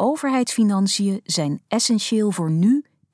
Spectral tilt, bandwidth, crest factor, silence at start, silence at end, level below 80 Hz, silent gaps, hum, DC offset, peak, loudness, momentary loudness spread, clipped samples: -5 dB/octave; 11 kHz; 12 dB; 0 s; 0.3 s; -74 dBFS; none; none; under 0.1%; -8 dBFS; -20 LUFS; 4 LU; under 0.1%